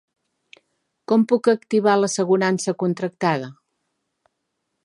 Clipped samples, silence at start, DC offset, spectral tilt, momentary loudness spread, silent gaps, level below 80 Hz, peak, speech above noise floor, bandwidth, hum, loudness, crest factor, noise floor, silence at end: under 0.1%; 1.1 s; under 0.1%; -5.5 dB/octave; 6 LU; none; -76 dBFS; -4 dBFS; 57 dB; 11.5 kHz; none; -20 LUFS; 18 dB; -77 dBFS; 1.3 s